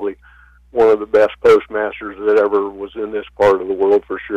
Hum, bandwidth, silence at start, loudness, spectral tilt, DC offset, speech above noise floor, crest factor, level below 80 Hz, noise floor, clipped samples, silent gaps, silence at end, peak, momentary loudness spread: 60 Hz at -55 dBFS; 8.2 kHz; 0 s; -16 LUFS; -6 dB/octave; under 0.1%; 31 dB; 10 dB; -48 dBFS; -46 dBFS; under 0.1%; none; 0 s; -6 dBFS; 12 LU